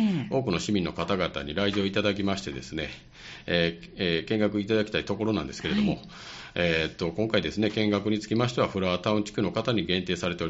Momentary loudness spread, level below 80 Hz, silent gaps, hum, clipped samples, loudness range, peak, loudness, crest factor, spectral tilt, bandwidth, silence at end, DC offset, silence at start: 9 LU; -52 dBFS; none; none; under 0.1%; 2 LU; -8 dBFS; -28 LUFS; 18 dB; -4 dB/octave; 8 kHz; 0 s; under 0.1%; 0 s